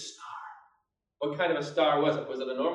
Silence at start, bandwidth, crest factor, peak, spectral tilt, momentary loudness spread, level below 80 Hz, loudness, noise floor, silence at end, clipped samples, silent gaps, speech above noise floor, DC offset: 0 s; 10.5 kHz; 18 dB; -14 dBFS; -5 dB/octave; 18 LU; -82 dBFS; -29 LUFS; -75 dBFS; 0 s; under 0.1%; none; 47 dB; under 0.1%